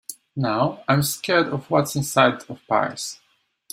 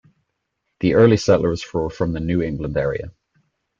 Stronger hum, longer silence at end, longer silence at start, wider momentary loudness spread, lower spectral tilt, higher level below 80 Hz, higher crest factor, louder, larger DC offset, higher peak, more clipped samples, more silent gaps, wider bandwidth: neither; second, 0.55 s vs 0.7 s; second, 0.1 s vs 0.8 s; about the same, 13 LU vs 11 LU; second, -4.5 dB/octave vs -7 dB/octave; second, -58 dBFS vs -42 dBFS; about the same, 20 dB vs 18 dB; second, -22 LUFS vs -19 LUFS; neither; about the same, -2 dBFS vs -2 dBFS; neither; neither; first, 16 kHz vs 7.6 kHz